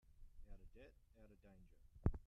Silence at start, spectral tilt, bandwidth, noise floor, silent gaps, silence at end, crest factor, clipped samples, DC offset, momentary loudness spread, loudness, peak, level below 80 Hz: 0.1 s; -10 dB/octave; 5.6 kHz; -67 dBFS; none; 0 s; 28 dB; under 0.1%; under 0.1%; 23 LU; -48 LUFS; -22 dBFS; -54 dBFS